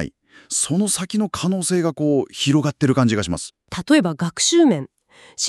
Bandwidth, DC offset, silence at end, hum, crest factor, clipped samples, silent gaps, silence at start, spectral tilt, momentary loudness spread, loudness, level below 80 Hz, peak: 13.5 kHz; under 0.1%; 0 s; none; 16 dB; under 0.1%; none; 0 s; -4.5 dB/octave; 12 LU; -19 LUFS; -50 dBFS; -4 dBFS